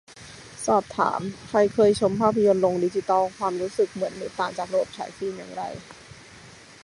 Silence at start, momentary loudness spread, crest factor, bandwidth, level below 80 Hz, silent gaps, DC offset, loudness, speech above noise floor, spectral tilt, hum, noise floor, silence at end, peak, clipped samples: 0.1 s; 21 LU; 20 dB; 11.5 kHz; -58 dBFS; none; under 0.1%; -24 LUFS; 24 dB; -5.5 dB/octave; none; -47 dBFS; 0.3 s; -4 dBFS; under 0.1%